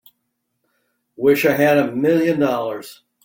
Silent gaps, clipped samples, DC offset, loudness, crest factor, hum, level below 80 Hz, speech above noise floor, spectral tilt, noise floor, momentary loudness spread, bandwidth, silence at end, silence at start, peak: none; under 0.1%; under 0.1%; -17 LUFS; 16 dB; none; -62 dBFS; 57 dB; -6 dB/octave; -74 dBFS; 9 LU; 17 kHz; 0.3 s; 1.2 s; -2 dBFS